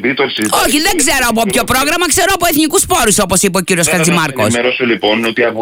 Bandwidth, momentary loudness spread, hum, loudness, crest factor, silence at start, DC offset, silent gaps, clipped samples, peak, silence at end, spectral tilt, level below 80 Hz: 16.5 kHz; 3 LU; none; -11 LUFS; 12 dB; 0 s; under 0.1%; none; under 0.1%; 0 dBFS; 0 s; -3 dB/octave; -36 dBFS